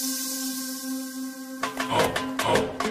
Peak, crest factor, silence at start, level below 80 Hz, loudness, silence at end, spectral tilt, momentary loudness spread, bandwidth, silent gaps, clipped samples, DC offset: -8 dBFS; 20 dB; 0 s; -56 dBFS; -27 LUFS; 0 s; -3 dB/octave; 9 LU; 15.5 kHz; none; under 0.1%; under 0.1%